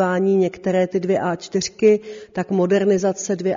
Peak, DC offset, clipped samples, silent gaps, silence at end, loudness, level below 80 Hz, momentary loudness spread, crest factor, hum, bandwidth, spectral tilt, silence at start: -4 dBFS; under 0.1%; under 0.1%; none; 0 s; -19 LUFS; -60 dBFS; 6 LU; 16 dB; none; 7.6 kHz; -6 dB/octave; 0 s